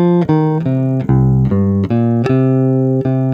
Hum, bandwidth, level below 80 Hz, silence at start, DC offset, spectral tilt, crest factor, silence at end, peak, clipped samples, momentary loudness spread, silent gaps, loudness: none; 5.2 kHz; -34 dBFS; 0 s; under 0.1%; -11 dB/octave; 12 dB; 0 s; -2 dBFS; under 0.1%; 3 LU; none; -14 LUFS